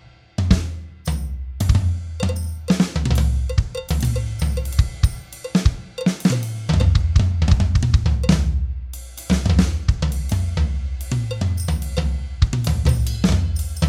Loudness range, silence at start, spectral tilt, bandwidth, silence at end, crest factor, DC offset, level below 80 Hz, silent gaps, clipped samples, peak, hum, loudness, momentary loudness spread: 3 LU; 0.4 s; -6 dB/octave; 15.5 kHz; 0 s; 18 dB; under 0.1%; -24 dBFS; none; under 0.1%; 0 dBFS; none; -21 LUFS; 9 LU